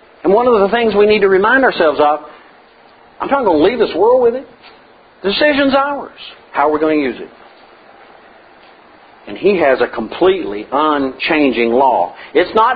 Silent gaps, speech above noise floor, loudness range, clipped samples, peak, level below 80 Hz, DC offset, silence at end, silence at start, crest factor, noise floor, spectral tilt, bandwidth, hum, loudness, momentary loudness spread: none; 31 dB; 6 LU; under 0.1%; 0 dBFS; -48 dBFS; under 0.1%; 0 s; 0.25 s; 14 dB; -44 dBFS; -8 dB/octave; 5 kHz; none; -13 LUFS; 11 LU